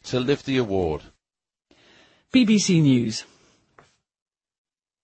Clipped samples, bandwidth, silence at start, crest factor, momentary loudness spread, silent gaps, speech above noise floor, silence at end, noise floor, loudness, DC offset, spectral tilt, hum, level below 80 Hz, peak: under 0.1%; 8.8 kHz; 0.05 s; 18 dB; 11 LU; none; over 70 dB; 1.8 s; under -90 dBFS; -21 LUFS; under 0.1%; -5.5 dB/octave; none; -52 dBFS; -6 dBFS